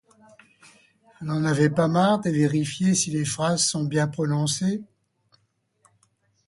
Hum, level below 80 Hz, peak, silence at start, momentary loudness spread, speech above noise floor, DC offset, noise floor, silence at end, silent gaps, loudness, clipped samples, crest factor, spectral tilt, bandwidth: none; -62 dBFS; -6 dBFS; 1.2 s; 6 LU; 47 dB; under 0.1%; -70 dBFS; 1.65 s; none; -23 LUFS; under 0.1%; 18 dB; -5 dB/octave; 11.5 kHz